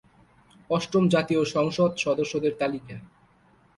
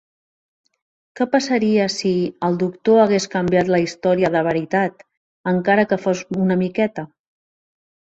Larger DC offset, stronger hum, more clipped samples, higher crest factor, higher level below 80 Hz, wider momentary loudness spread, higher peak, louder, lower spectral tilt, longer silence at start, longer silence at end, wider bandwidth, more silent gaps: neither; neither; neither; about the same, 18 dB vs 18 dB; about the same, -62 dBFS vs -58 dBFS; first, 11 LU vs 6 LU; second, -10 dBFS vs -2 dBFS; second, -25 LUFS vs -19 LUFS; about the same, -6 dB/octave vs -6 dB/octave; second, 0.7 s vs 1.15 s; second, 0.7 s vs 1 s; first, 11.5 kHz vs 8 kHz; second, none vs 5.17-5.44 s